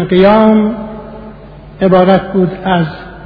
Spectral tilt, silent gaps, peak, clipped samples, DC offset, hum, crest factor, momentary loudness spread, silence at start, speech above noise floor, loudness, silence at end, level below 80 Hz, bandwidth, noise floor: -10 dB/octave; none; 0 dBFS; 0.4%; under 0.1%; none; 12 dB; 20 LU; 0 s; 23 dB; -10 LUFS; 0 s; -36 dBFS; 5.4 kHz; -32 dBFS